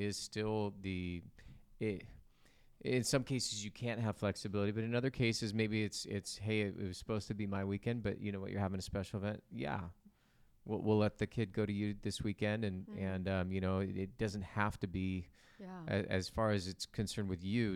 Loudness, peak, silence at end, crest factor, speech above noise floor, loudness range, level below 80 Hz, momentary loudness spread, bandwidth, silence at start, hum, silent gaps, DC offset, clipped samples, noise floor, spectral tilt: -39 LUFS; -18 dBFS; 0 s; 20 dB; 30 dB; 3 LU; -62 dBFS; 8 LU; 14.5 kHz; 0 s; none; none; under 0.1%; under 0.1%; -69 dBFS; -5.5 dB/octave